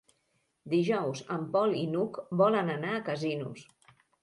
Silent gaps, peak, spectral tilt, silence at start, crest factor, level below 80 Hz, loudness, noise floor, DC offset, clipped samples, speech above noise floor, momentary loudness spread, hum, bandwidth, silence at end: none; -12 dBFS; -6.5 dB/octave; 0.65 s; 18 dB; -76 dBFS; -30 LUFS; -76 dBFS; under 0.1%; under 0.1%; 46 dB; 9 LU; none; 11.5 kHz; 0.6 s